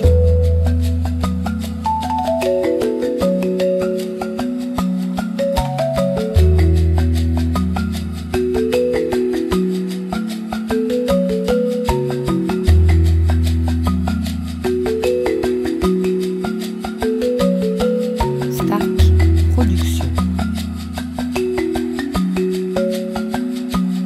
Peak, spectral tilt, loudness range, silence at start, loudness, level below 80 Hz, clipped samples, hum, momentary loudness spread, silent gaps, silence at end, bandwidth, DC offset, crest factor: -2 dBFS; -7.5 dB/octave; 3 LU; 0 s; -18 LUFS; -24 dBFS; under 0.1%; none; 8 LU; none; 0 s; 14 kHz; under 0.1%; 16 dB